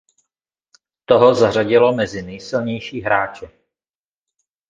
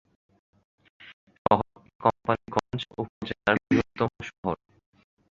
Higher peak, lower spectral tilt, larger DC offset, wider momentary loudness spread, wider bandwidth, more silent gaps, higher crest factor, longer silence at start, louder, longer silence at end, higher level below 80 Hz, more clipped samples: first, 0 dBFS vs -4 dBFS; about the same, -6 dB/octave vs -6.5 dB/octave; neither; first, 13 LU vs 10 LU; about the same, 7.6 kHz vs 7.8 kHz; second, none vs 1.13-1.27 s, 1.38-1.45 s, 1.95-1.99 s, 3.09-3.21 s, 4.38-4.43 s; second, 18 dB vs 26 dB; about the same, 1.1 s vs 1 s; first, -17 LUFS vs -28 LUFS; first, 1.25 s vs 0.85 s; about the same, -54 dBFS vs -56 dBFS; neither